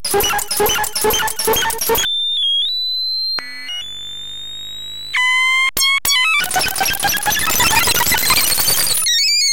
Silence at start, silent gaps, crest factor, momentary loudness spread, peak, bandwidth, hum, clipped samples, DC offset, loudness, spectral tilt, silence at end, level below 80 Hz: 0.05 s; none; 16 dB; 14 LU; -2 dBFS; 18 kHz; none; under 0.1%; 2%; -14 LUFS; 0 dB/octave; 0 s; -40 dBFS